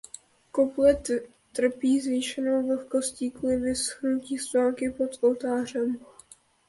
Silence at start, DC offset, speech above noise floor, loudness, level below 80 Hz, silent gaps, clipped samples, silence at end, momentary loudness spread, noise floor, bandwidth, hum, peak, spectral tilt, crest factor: 0.55 s; under 0.1%; 29 dB; -27 LUFS; -56 dBFS; none; under 0.1%; 0.65 s; 9 LU; -55 dBFS; 11.5 kHz; none; -10 dBFS; -3.5 dB/octave; 18 dB